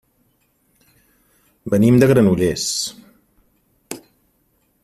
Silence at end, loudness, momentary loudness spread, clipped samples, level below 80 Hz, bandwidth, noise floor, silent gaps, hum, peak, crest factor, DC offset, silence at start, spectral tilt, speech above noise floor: 0.85 s; -16 LUFS; 22 LU; under 0.1%; -50 dBFS; 15 kHz; -63 dBFS; none; none; 0 dBFS; 20 dB; under 0.1%; 1.65 s; -5.5 dB/octave; 49 dB